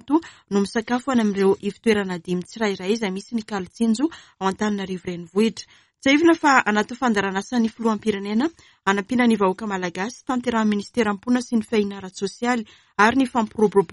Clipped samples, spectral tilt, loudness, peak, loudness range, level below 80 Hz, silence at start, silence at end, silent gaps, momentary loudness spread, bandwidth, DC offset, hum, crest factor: under 0.1%; -5 dB/octave; -22 LUFS; -2 dBFS; 4 LU; -58 dBFS; 0.1 s; 0 s; none; 10 LU; 11.5 kHz; under 0.1%; none; 20 dB